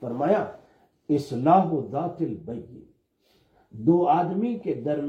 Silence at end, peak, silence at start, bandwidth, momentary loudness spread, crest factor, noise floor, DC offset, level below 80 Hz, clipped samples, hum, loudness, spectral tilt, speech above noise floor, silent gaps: 0 s; -8 dBFS; 0 s; 8.8 kHz; 14 LU; 18 dB; -66 dBFS; under 0.1%; -66 dBFS; under 0.1%; none; -24 LUFS; -9 dB/octave; 42 dB; none